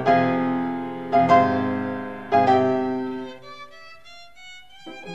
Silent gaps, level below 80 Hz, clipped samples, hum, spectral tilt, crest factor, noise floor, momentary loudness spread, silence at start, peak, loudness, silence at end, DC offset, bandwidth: none; -60 dBFS; under 0.1%; none; -7.5 dB/octave; 18 dB; -47 dBFS; 25 LU; 0 s; -4 dBFS; -21 LUFS; 0 s; 0.4%; 7.8 kHz